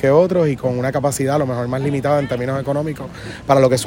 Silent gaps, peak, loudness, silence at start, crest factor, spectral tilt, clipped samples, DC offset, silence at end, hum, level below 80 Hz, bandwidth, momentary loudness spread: none; 0 dBFS; -18 LUFS; 0 s; 16 dB; -6 dB/octave; under 0.1%; under 0.1%; 0 s; none; -46 dBFS; 16.5 kHz; 11 LU